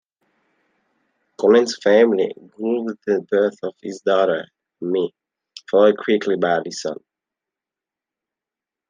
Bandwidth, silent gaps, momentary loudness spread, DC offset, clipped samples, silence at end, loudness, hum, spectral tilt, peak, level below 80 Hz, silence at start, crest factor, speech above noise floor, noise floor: 9.6 kHz; none; 14 LU; under 0.1%; under 0.1%; 1.95 s; -19 LUFS; none; -5 dB/octave; -2 dBFS; -76 dBFS; 1.4 s; 20 dB; 70 dB; -88 dBFS